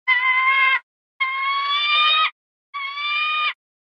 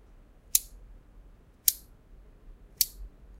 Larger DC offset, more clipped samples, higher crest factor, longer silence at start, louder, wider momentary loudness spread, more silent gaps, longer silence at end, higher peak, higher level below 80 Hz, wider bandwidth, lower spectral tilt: neither; neither; second, 14 dB vs 36 dB; second, 0.05 s vs 0.55 s; first, -18 LUFS vs -28 LUFS; second, 10 LU vs 21 LU; first, 0.83-1.20 s, 2.32-2.73 s vs none; about the same, 0.3 s vs 0.3 s; second, -6 dBFS vs 0 dBFS; second, -88 dBFS vs -52 dBFS; second, 6.4 kHz vs 16 kHz; second, 3 dB/octave vs 1 dB/octave